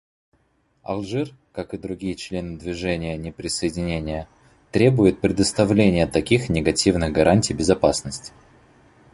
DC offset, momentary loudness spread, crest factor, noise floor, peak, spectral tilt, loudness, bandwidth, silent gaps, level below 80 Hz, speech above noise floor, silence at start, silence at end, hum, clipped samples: under 0.1%; 14 LU; 20 dB; -65 dBFS; -2 dBFS; -5.5 dB/octave; -21 LUFS; 11.5 kHz; none; -40 dBFS; 44 dB; 0.9 s; 0.85 s; none; under 0.1%